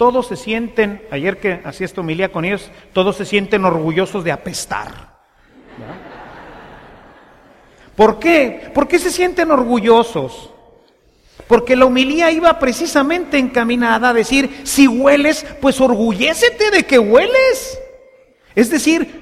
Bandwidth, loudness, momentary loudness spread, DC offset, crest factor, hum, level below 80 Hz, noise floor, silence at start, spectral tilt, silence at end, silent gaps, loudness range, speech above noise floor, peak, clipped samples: 15.5 kHz; -14 LUFS; 13 LU; under 0.1%; 16 dB; none; -42 dBFS; -52 dBFS; 0 s; -4 dB/octave; 0 s; none; 8 LU; 38 dB; 0 dBFS; under 0.1%